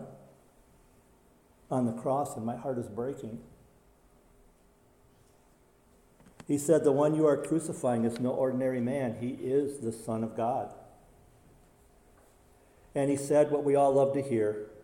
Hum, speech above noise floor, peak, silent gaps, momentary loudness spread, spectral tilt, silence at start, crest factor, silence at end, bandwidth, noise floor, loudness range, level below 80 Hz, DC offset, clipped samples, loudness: none; 34 dB; -12 dBFS; none; 12 LU; -7 dB/octave; 0 s; 20 dB; 0 s; 16.5 kHz; -63 dBFS; 12 LU; -66 dBFS; under 0.1%; under 0.1%; -30 LUFS